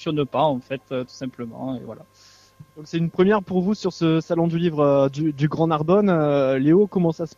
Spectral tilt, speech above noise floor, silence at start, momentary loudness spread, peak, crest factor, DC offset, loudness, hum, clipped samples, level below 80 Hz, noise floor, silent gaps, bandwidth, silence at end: -8 dB/octave; 28 dB; 0 s; 13 LU; -4 dBFS; 16 dB; under 0.1%; -21 LUFS; none; under 0.1%; -58 dBFS; -49 dBFS; none; 7.4 kHz; 0.1 s